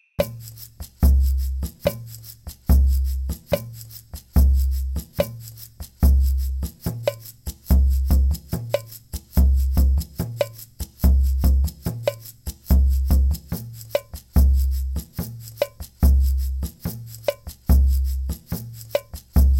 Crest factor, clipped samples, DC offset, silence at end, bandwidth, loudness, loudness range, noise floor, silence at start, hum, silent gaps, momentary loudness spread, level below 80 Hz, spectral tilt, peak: 16 dB; under 0.1%; under 0.1%; 0 s; 17 kHz; -23 LUFS; 2 LU; -40 dBFS; 0.2 s; none; none; 17 LU; -22 dBFS; -7 dB/octave; -4 dBFS